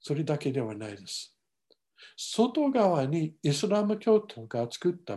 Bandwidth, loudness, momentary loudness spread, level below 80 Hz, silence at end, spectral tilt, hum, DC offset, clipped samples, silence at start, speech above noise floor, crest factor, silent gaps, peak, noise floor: 12.5 kHz; -29 LUFS; 13 LU; -74 dBFS; 0 s; -6 dB/octave; none; under 0.1%; under 0.1%; 0.05 s; 42 dB; 16 dB; none; -12 dBFS; -71 dBFS